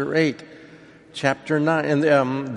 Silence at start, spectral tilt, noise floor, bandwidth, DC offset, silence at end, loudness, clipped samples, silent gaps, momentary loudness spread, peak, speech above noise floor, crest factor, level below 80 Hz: 0 s; -6.5 dB/octave; -47 dBFS; 11 kHz; under 0.1%; 0 s; -21 LUFS; under 0.1%; none; 11 LU; -2 dBFS; 26 dB; 18 dB; -64 dBFS